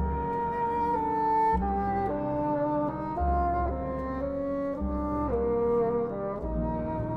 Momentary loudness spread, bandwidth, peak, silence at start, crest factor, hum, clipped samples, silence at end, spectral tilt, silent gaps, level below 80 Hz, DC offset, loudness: 6 LU; 5.6 kHz; -16 dBFS; 0 s; 12 dB; none; under 0.1%; 0 s; -10 dB/octave; none; -38 dBFS; under 0.1%; -29 LUFS